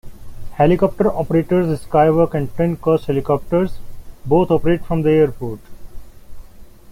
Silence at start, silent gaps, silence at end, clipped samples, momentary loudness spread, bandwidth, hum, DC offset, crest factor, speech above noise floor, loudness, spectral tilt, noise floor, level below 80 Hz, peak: 0.05 s; none; 0 s; under 0.1%; 10 LU; 16 kHz; none; under 0.1%; 16 dB; 22 dB; -17 LUFS; -9 dB/octave; -38 dBFS; -36 dBFS; -2 dBFS